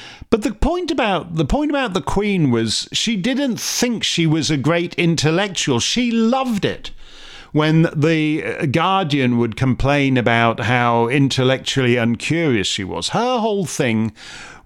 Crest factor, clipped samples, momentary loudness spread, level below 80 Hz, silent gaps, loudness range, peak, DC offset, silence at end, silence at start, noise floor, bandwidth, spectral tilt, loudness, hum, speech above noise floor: 18 dB; under 0.1%; 5 LU; -36 dBFS; none; 2 LU; 0 dBFS; under 0.1%; 0.05 s; 0 s; -38 dBFS; 16 kHz; -5 dB/octave; -18 LUFS; none; 20 dB